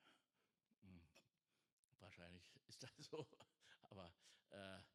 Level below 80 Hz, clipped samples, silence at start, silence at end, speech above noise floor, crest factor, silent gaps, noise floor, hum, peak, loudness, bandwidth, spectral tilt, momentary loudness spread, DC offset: under -90 dBFS; under 0.1%; 0 s; 0 s; over 29 dB; 26 dB; 0.78-0.82 s, 1.72-1.88 s; under -90 dBFS; none; -38 dBFS; -62 LUFS; 13 kHz; -4.5 dB/octave; 13 LU; under 0.1%